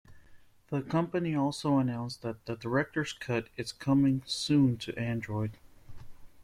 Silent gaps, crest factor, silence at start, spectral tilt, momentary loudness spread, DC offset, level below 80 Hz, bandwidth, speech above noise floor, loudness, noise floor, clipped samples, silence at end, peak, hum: none; 16 dB; 0.1 s; -6 dB/octave; 11 LU; under 0.1%; -58 dBFS; 13 kHz; 25 dB; -31 LUFS; -55 dBFS; under 0.1%; 0 s; -14 dBFS; none